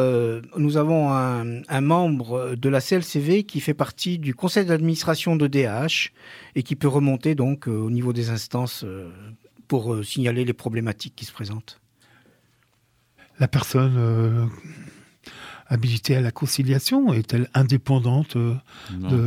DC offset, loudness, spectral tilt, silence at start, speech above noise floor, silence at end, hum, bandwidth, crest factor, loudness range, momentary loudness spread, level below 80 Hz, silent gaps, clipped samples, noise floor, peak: under 0.1%; -23 LUFS; -6.5 dB/octave; 0 s; 43 dB; 0 s; none; 16 kHz; 18 dB; 6 LU; 13 LU; -58 dBFS; none; under 0.1%; -65 dBFS; -4 dBFS